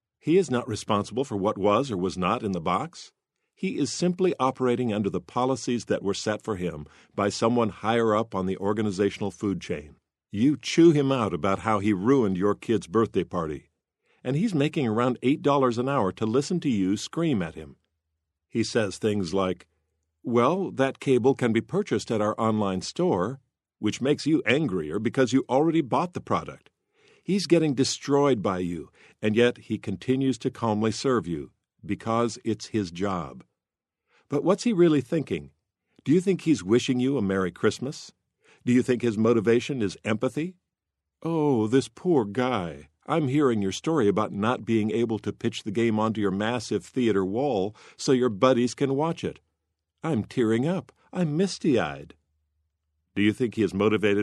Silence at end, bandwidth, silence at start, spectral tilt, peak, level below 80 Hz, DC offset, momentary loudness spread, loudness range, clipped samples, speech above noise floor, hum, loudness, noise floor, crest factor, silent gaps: 0 s; 12 kHz; 0.25 s; -6 dB/octave; -4 dBFS; -60 dBFS; under 0.1%; 10 LU; 3 LU; under 0.1%; 64 dB; none; -25 LUFS; -89 dBFS; 20 dB; none